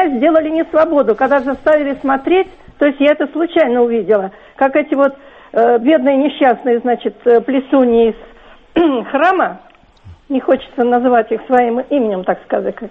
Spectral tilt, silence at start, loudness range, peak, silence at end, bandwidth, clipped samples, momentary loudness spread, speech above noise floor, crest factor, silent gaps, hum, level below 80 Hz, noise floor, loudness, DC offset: -7.5 dB/octave; 0 s; 3 LU; 0 dBFS; 0 s; 5.2 kHz; under 0.1%; 6 LU; 27 dB; 12 dB; none; none; -48 dBFS; -41 dBFS; -14 LUFS; under 0.1%